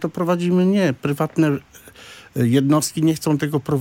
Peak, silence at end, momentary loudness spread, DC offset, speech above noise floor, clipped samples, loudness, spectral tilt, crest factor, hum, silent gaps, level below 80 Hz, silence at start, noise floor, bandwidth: -6 dBFS; 0 s; 6 LU; under 0.1%; 24 dB; under 0.1%; -19 LUFS; -6 dB/octave; 14 dB; none; none; -58 dBFS; 0 s; -43 dBFS; 17 kHz